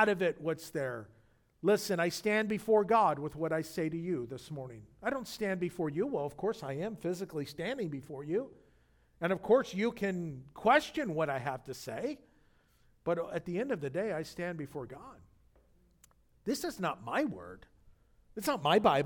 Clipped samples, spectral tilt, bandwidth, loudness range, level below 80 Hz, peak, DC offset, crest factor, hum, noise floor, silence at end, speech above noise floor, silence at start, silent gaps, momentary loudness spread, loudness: under 0.1%; -5.5 dB/octave; 19 kHz; 8 LU; -66 dBFS; -12 dBFS; under 0.1%; 22 dB; none; -67 dBFS; 0 s; 34 dB; 0 s; none; 15 LU; -34 LUFS